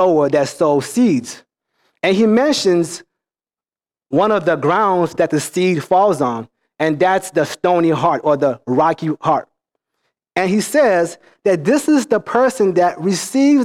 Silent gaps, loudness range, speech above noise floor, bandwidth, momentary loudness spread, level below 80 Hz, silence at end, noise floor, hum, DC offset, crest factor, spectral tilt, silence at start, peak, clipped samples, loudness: none; 2 LU; over 75 dB; 15.5 kHz; 7 LU; -60 dBFS; 0 s; under -90 dBFS; none; under 0.1%; 12 dB; -5.5 dB/octave; 0 s; -4 dBFS; under 0.1%; -16 LUFS